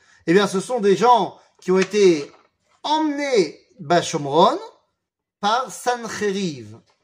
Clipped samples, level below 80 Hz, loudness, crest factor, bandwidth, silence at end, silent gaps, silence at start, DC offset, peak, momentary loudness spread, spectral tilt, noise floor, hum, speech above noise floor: under 0.1%; -70 dBFS; -20 LUFS; 18 dB; 15.5 kHz; 0.25 s; none; 0.25 s; under 0.1%; -2 dBFS; 13 LU; -5 dB/octave; -80 dBFS; none; 61 dB